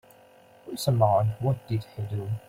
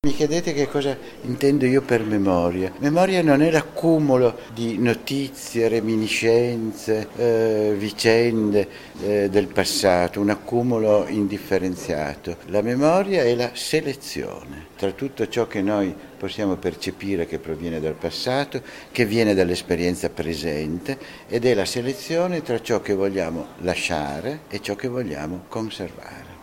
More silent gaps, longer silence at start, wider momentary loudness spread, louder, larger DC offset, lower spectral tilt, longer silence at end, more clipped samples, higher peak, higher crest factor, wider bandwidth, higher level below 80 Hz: neither; first, 0.65 s vs 0.05 s; about the same, 12 LU vs 11 LU; second, -27 LUFS vs -22 LUFS; neither; first, -7 dB/octave vs -5.5 dB/octave; about the same, 0.1 s vs 0 s; neither; second, -6 dBFS vs 0 dBFS; about the same, 20 dB vs 22 dB; about the same, 16 kHz vs 16.5 kHz; second, -58 dBFS vs -50 dBFS